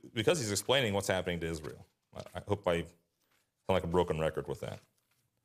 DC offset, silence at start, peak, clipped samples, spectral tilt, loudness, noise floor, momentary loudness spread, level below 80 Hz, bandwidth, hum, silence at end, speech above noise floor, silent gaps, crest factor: under 0.1%; 0.05 s; -12 dBFS; under 0.1%; -4.5 dB/octave; -33 LUFS; -77 dBFS; 19 LU; -60 dBFS; 15.5 kHz; none; 0.65 s; 44 dB; none; 22 dB